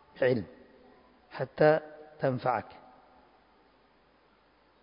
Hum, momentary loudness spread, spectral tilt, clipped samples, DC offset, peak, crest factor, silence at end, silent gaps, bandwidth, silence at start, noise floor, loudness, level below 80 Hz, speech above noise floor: none; 23 LU; -5.5 dB/octave; under 0.1%; under 0.1%; -10 dBFS; 22 dB; 2.2 s; none; 5.2 kHz; 0.15 s; -65 dBFS; -29 LUFS; -68 dBFS; 37 dB